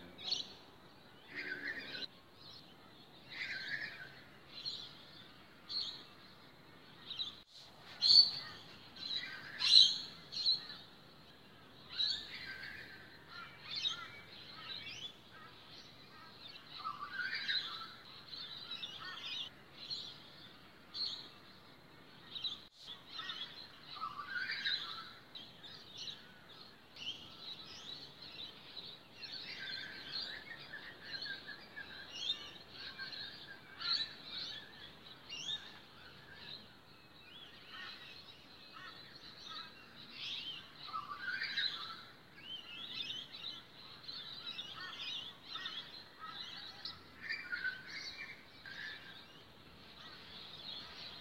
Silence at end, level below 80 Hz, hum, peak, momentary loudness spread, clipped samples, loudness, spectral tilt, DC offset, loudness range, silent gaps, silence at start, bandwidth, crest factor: 0 s; -76 dBFS; none; -10 dBFS; 19 LU; under 0.1%; -38 LUFS; -1 dB/octave; under 0.1%; 16 LU; none; 0 s; 16 kHz; 34 dB